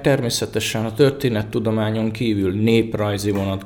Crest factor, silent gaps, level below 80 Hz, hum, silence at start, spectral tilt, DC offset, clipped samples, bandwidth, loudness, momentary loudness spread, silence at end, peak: 16 dB; none; -46 dBFS; none; 0 s; -5.5 dB/octave; under 0.1%; under 0.1%; 19.5 kHz; -20 LUFS; 4 LU; 0 s; -4 dBFS